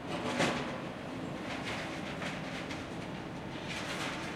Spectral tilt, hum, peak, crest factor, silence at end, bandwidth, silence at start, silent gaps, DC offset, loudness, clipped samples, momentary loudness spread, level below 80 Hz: -4.5 dB/octave; none; -18 dBFS; 18 dB; 0 s; 16 kHz; 0 s; none; under 0.1%; -37 LUFS; under 0.1%; 9 LU; -60 dBFS